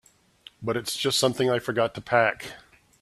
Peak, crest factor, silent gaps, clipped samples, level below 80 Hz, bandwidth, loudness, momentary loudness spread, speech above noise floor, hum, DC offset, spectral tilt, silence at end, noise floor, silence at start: -6 dBFS; 22 dB; none; under 0.1%; -62 dBFS; 15 kHz; -25 LUFS; 12 LU; 28 dB; none; under 0.1%; -3.5 dB/octave; 0.4 s; -53 dBFS; 0.6 s